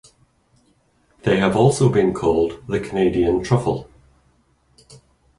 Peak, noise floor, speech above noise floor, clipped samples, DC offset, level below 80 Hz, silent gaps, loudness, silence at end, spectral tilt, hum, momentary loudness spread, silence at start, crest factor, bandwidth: -2 dBFS; -61 dBFS; 43 dB; under 0.1%; under 0.1%; -44 dBFS; none; -19 LUFS; 0.45 s; -6.5 dB/octave; none; 10 LU; 1.25 s; 18 dB; 11.5 kHz